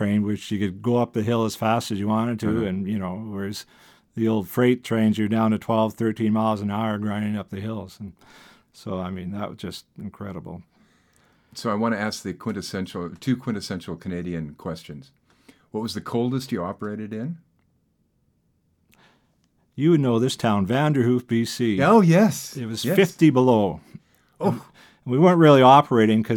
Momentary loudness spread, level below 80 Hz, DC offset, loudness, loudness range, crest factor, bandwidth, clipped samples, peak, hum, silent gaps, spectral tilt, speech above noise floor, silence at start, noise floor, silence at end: 19 LU; -60 dBFS; under 0.1%; -22 LUFS; 13 LU; 22 dB; 18.5 kHz; under 0.1%; -2 dBFS; none; none; -6.5 dB/octave; 46 dB; 0 s; -67 dBFS; 0 s